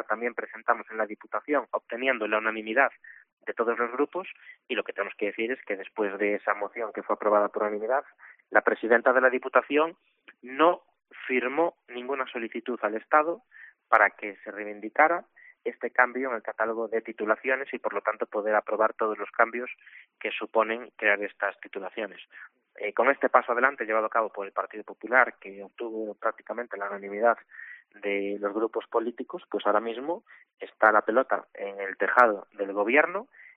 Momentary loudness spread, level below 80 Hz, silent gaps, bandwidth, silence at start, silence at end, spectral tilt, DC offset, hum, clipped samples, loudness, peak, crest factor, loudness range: 14 LU; -80 dBFS; 3.33-3.37 s; 4.3 kHz; 0 s; 0.1 s; -1.5 dB/octave; under 0.1%; none; under 0.1%; -27 LUFS; -4 dBFS; 24 dB; 5 LU